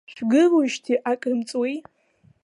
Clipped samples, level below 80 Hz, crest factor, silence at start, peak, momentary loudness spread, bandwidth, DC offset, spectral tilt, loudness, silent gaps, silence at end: under 0.1%; -74 dBFS; 14 dB; 0.1 s; -8 dBFS; 10 LU; 11 kHz; under 0.1%; -4.5 dB/octave; -22 LUFS; none; 0.65 s